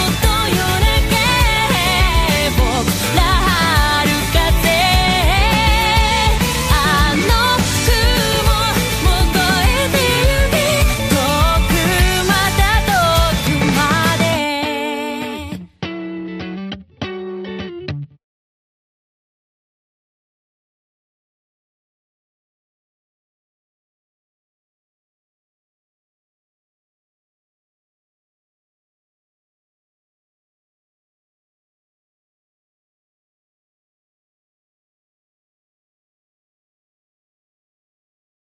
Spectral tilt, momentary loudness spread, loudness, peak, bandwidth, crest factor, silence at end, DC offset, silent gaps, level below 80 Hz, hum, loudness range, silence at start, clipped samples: -4 dB/octave; 14 LU; -14 LUFS; 0 dBFS; 15.5 kHz; 18 dB; 20.5 s; under 0.1%; none; -24 dBFS; none; 15 LU; 0 s; under 0.1%